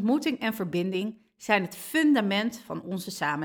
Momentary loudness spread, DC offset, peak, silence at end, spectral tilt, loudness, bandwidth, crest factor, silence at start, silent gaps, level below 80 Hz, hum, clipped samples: 12 LU; under 0.1%; -8 dBFS; 0 s; -5 dB/octave; -27 LUFS; 19 kHz; 20 dB; 0 s; none; -70 dBFS; none; under 0.1%